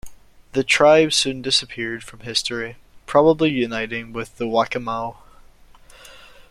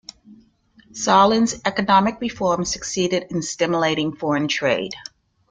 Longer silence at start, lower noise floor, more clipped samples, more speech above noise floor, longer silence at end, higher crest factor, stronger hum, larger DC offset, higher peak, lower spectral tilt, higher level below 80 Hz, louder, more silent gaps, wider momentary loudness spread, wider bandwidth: second, 0.05 s vs 0.3 s; second, -47 dBFS vs -55 dBFS; neither; second, 28 dB vs 35 dB; second, 0.1 s vs 0.5 s; about the same, 20 dB vs 20 dB; neither; neither; about the same, -2 dBFS vs -2 dBFS; about the same, -3.5 dB/octave vs -4 dB/octave; about the same, -50 dBFS vs -54 dBFS; about the same, -19 LUFS vs -20 LUFS; neither; about the same, 15 LU vs 13 LU; first, 14 kHz vs 9.6 kHz